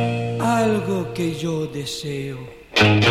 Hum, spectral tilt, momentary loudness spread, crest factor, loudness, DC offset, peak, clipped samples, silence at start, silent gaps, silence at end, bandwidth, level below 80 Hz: none; -5.5 dB/octave; 12 LU; 20 dB; -21 LUFS; under 0.1%; -2 dBFS; under 0.1%; 0 s; none; 0 s; 15.5 kHz; -48 dBFS